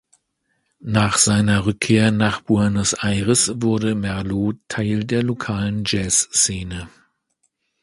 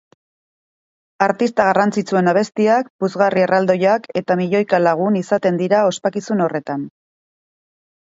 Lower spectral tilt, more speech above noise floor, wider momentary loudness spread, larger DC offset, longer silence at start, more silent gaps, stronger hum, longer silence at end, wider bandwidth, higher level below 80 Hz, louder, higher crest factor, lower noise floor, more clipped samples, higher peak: second, -4 dB/octave vs -6.5 dB/octave; second, 51 dB vs over 74 dB; about the same, 8 LU vs 6 LU; neither; second, 0.85 s vs 1.2 s; second, none vs 2.90-2.99 s; neither; second, 0.95 s vs 1.2 s; first, 11.5 kHz vs 8 kHz; first, -42 dBFS vs -66 dBFS; about the same, -19 LUFS vs -17 LUFS; about the same, 18 dB vs 18 dB; second, -70 dBFS vs under -90 dBFS; neither; about the same, -2 dBFS vs 0 dBFS